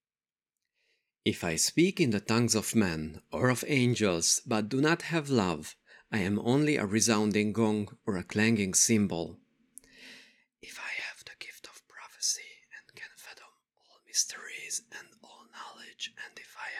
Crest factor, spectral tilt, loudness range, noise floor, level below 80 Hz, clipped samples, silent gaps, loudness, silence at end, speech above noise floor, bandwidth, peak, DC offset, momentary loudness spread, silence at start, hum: 20 dB; -3.5 dB/octave; 11 LU; under -90 dBFS; -64 dBFS; under 0.1%; none; -29 LUFS; 0 s; over 62 dB; 16 kHz; -10 dBFS; under 0.1%; 22 LU; 1.25 s; none